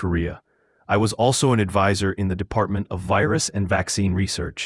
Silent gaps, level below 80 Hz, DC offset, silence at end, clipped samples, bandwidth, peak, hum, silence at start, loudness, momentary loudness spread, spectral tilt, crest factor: none; -44 dBFS; under 0.1%; 0 s; under 0.1%; 12 kHz; -4 dBFS; none; 0 s; -22 LUFS; 7 LU; -5 dB/octave; 18 dB